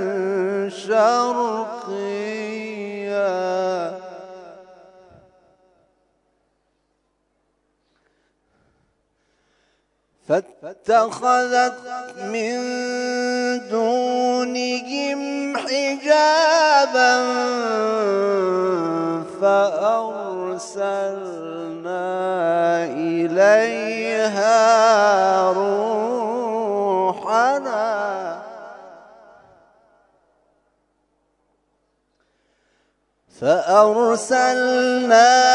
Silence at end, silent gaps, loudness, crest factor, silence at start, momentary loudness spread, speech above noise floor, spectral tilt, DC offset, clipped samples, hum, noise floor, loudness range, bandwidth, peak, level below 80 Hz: 0 s; none; -19 LUFS; 20 dB; 0 s; 14 LU; 51 dB; -3.5 dB/octave; under 0.1%; under 0.1%; none; -69 dBFS; 10 LU; 11 kHz; -2 dBFS; -74 dBFS